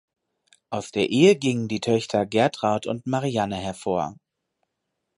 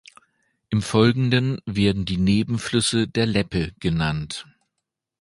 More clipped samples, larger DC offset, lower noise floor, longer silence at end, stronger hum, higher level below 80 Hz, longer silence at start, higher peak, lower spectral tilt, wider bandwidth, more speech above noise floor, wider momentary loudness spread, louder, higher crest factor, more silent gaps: neither; neither; about the same, -80 dBFS vs -81 dBFS; first, 1.05 s vs 0.8 s; neither; second, -58 dBFS vs -42 dBFS; about the same, 0.7 s vs 0.7 s; about the same, -4 dBFS vs -2 dBFS; about the same, -5.5 dB/octave vs -5.5 dB/octave; about the same, 11.5 kHz vs 11.5 kHz; about the same, 57 dB vs 60 dB; first, 12 LU vs 8 LU; about the same, -23 LUFS vs -22 LUFS; about the same, 20 dB vs 20 dB; neither